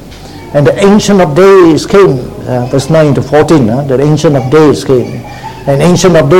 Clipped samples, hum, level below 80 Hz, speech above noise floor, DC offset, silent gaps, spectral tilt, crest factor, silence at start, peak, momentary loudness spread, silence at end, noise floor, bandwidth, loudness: 4%; none; -32 dBFS; 21 dB; 1%; none; -6.5 dB/octave; 6 dB; 0 s; 0 dBFS; 12 LU; 0 s; -26 dBFS; 16.5 kHz; -7 LUFS